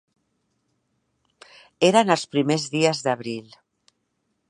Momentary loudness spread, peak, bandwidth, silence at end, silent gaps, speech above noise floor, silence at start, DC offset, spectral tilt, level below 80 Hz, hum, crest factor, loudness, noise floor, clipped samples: 12 LU; -2 dBFS; 11.5 kHz; 1.1 s; none; 53 dB; 1.8 s; under 0.1%; -4.5 dB/octave; -72 dBFS; none; 24 dB; -21 LUFS; -74 dBFS; under 0.1%